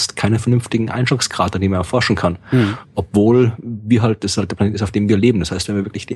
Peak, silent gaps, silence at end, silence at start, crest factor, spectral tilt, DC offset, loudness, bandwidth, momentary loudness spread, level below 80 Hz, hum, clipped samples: -2 dBFS; none; 0 s; 0 s; 14 dB; -5.5 dB/octave; under 0.1%; -17 LUFS; 12 kHz; 6 LU; -42 dBFS; none; under 0.1%